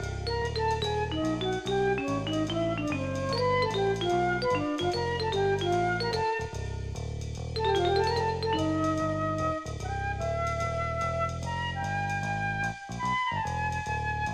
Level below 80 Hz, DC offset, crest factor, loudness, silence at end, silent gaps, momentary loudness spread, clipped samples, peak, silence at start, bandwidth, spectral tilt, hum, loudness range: -44 dBFS; under 0.1%; 14 dB; -29 LUFS; 0 s; none; 6 LU; under 0.1%; -14 dBFS; 0 s; 14 kHz; -5.5 dB/octave; none; 3 LU